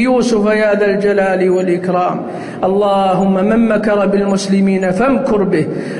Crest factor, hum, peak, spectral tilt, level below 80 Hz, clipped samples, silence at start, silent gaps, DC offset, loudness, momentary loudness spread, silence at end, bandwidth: 10 dB; none; -2 dBFS; -6.5 dB/octave; -44 dBFS; under 0.1%; 0 s; none; under 0.1%; -13 LUFS; 4 LU; 0 s; 11 kHz